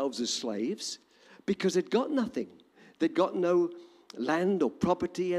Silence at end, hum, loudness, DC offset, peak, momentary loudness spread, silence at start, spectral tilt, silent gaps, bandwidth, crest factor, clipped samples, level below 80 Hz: 0 s; none; -30 LUFS; under 0.1%; -14 dBFS; 12 LU; 0 s; -5 dB/octave; none; 12.5 kHz; 16 dB; under 0.1%; -68 dBFS